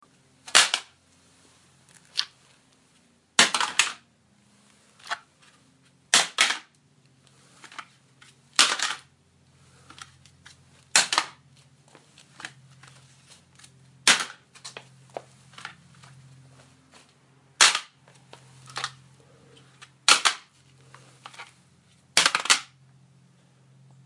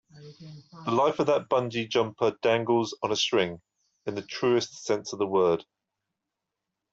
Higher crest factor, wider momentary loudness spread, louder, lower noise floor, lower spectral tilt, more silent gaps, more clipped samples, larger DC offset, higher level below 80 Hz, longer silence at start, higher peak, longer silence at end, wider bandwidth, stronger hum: first, 30 dB vs 18 dB; first, 25 LU vs 14 LU; first, -22 LUFS vs -27 LUFS; second, -62 dBFS vs -86 dBFS; second, 1 dB/octave vs -4.5 dB/octave; neither; neither; neither; second, -78 dBFS vs -70 dBFS; first, 0.45 s vs 0.15 s; first, 0 dBFS vs -10 dBFS; about the same, 1.4 s vs 1.3 s; first, 11.5 kHz vs 7.8 kHz; neither